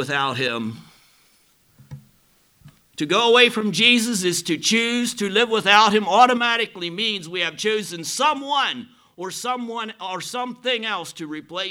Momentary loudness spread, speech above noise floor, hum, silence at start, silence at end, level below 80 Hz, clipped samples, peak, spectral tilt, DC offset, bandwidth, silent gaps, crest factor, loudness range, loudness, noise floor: 15 LU; 39 dB; none; 0 s; 0 s; -68 dBFS; under 0.1%; 0 dBFS; -2.5 dB/octave; under 0.1%; 17.5 kHz; none; 22 dB; 8 LU; -19 LUFS; -60 dBFS